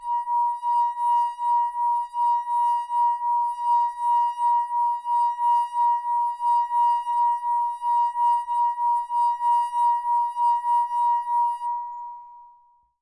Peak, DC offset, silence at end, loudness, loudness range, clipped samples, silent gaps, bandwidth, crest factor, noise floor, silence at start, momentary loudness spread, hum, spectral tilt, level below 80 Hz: -14 dBFS; under 0.1%; 0.55 s; -23 LUFS; 1 LU; under 0.1%; none; 11 kHz; 8 dB; -58 dBFS; 0 s; 3 LU; none; 2 dB/octave; -72 dBFS